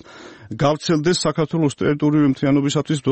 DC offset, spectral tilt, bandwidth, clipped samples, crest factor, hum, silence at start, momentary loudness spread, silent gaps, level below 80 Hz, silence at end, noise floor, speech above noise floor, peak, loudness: under 0.1%; -6 dB/octave; 8.8 kHz; under 0.1%; 14 dB; none; 0.1 s; 4 LU; none; -52 dBFS; 0 s; -41 dBFS; 23 dB; -4 dBFS; -19 LUFS